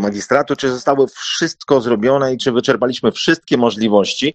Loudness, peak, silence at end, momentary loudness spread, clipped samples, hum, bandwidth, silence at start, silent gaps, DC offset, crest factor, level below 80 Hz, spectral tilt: -16 LUFS; 0 dBFS; 0 s; 3 LU; under 0.1%; none; 8.6 kHz; 0 s; none; under 0.1%; 16 dB; -54 dBFS; -4.5 dB/octave